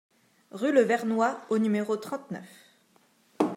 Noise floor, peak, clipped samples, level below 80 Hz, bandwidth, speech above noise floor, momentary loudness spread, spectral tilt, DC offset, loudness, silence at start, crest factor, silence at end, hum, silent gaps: -64 dBFS; -10 dBFS; under 0.1%; -84 dBFS; 15.5 kHz; 38 dB; 17 LU; -6 dB/octave; under 0.1%; -27 LUFS; 0.55 s; 20 dB; 0 s; none; none